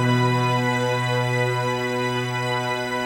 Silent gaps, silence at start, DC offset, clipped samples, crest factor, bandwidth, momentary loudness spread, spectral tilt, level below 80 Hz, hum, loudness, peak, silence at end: none; 0 s; under 0.1%; under 0.1%; 14 dB; 16.5 kHz; 4 LU; -5.5 dB/octave; -56 dBFS; none; -22 LUFS; -8 dBFS; 0 s